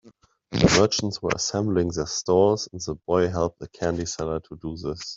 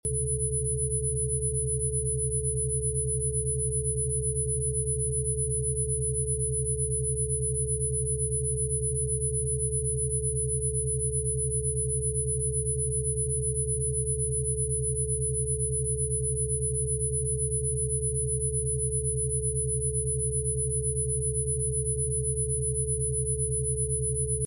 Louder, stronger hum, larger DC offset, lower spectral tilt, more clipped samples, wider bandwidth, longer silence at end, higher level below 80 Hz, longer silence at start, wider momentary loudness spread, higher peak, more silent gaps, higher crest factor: first, -24 LUFS vs -27 LUFS; neither; neither; second, -4.5 dB/octave vs -8.5 dB/octave; neither; second, 8 kHz vs 10.5 kHz; about the same, 0 s vs 0 s; second, -46 dBFS vs -36 dBFS; about the same, 0.05 s vs 0.05 s; first, 12 LU vs 0 LU; first, -4 dBFS vs -18 dBFS; neither; first, 20 dB vs 10 dB